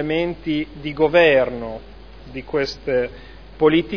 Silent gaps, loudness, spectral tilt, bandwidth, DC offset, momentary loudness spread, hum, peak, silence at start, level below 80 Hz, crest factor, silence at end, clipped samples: none; -20 LUFS; -6.5 dB/octave; 5.4 kHz; 0.4%; 18 LU; none; -2 dBFS; 0 s; -42 dBFS; 18 dB; 0 s; under 0.1%